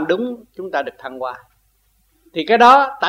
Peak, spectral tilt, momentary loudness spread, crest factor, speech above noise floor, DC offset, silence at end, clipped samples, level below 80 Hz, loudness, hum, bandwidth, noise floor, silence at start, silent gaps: 0 dBFS; -4 dB/octave; 19 LU; 18 dB; 44 dB; under 0.1%; 0 s; under 0.1%; -60 dBFS; -15 LUFS; none; 15.5 kHz; -61 dBFS; 0 s; none